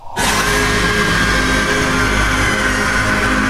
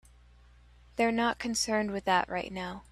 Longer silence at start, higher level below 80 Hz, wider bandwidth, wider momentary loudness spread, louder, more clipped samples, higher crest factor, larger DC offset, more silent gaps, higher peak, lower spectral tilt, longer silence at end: second, 0 s vs 0.95 s; first, -24 dBFS vs -56 dBFS; first, 16 kHz vs 14 kHz; second, 1 LU vs 10 LU; first, -14 LUFS vs -30 LUFS; neither; second, 12 dB vs 22 dB; neither; neither; first, -2 dBFS vs -10 dBFS; about the same, -3.5 dB/octave vs -3.5 dB/octave; about the same, 0 s vs 0.1 s